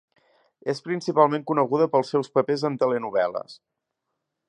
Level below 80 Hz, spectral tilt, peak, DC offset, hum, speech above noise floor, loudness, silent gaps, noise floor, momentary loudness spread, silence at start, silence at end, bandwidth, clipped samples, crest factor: -76 dBFS; -6.5 dB/octave; -4 dBFS; under 0.1%; none; 58 dB; -23 LUFS; none; -81 dBFS; 10 LU; 0.65 s; 0.95 s; 10.5 kHz; under 0.1%; 22 dB